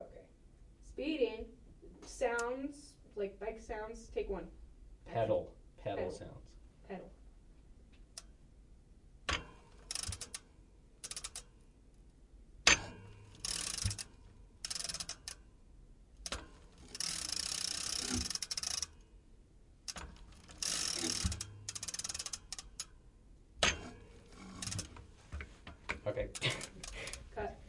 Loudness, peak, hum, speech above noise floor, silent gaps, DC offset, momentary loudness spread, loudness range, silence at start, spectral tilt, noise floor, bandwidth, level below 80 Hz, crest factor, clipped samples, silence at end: -39 LUFS; -8 dBFS; none; 21 dB; none; under 0.1%; 20 LU; 9 LU; 0 s; -2 dB/octave; -62 dBFS; 11.5 kHz; -56 dBFS; 34 dB; under 0.1%; 0 s